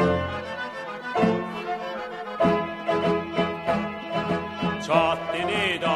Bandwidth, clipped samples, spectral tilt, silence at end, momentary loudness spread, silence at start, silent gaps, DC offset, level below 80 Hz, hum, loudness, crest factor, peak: 12.5 kHz; under 0.1%; -6 dB/octave; 0 s; 9 LU; 0 s; none; under 0.1%; -56 dBFS; none; -26 LUFS; 18 dB; -6 dBFS